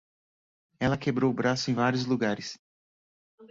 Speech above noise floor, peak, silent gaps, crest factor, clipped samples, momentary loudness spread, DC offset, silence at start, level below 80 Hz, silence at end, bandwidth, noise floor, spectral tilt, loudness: over 63 dB; -12 dBFS; 2.59-3.38 s; 18 dB; under 0.1%; 9 LU; under 0.1%; 0.8 s; -60 dBFS; 0.05 s; 7.8 kHz; under -90 dBFS; -5.5 dB/octave; -28 LUFS